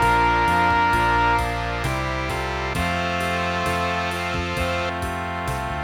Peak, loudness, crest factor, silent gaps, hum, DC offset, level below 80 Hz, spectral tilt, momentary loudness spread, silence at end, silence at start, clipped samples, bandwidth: -6 dBFS; -22 LUFS; 16 dB; none; none; under 0.1%; -34 dBFS; -5 dB/octave; 8 LU; 0 s; 0 s; under 0.1%; 18 kHz